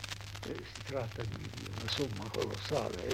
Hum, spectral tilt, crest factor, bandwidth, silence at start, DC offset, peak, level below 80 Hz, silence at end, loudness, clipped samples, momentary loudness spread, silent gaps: none; -4.5 dB/octave; 22 dB; 16.5 kHz; 0 s; under 0.1%; -16 dBFS; -56 dBFS; 0 s; -38 LUFS; under 0.1%; 7 LU; none